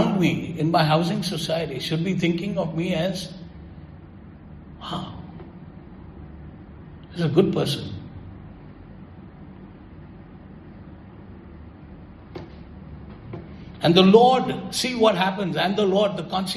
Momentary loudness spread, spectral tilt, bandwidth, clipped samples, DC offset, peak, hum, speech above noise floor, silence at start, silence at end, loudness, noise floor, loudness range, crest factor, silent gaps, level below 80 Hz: 24 LU; -6 dB/octave; 14 kHz; under 0.1%; under 0.1%; -2 dBFS; none; 22 dB; 0 s; 0 s; -21 LUFS; -43 dBFS; 23 LU; 22 dB; none; -50 dBFS